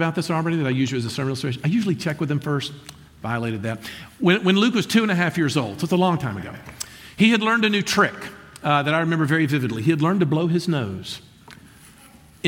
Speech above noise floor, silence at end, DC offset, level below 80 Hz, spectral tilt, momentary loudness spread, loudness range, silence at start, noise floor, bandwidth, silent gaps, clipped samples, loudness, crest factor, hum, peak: 27 dB; 0 s; under 0.1%; -56 dBFS; -5.5 dB/octave; 16 LU; 4 LU; 0 s; -49 dBFS; 17 kHz; none; under 0.1%; -21 LUFS; 18 dB; none; -4 dBFS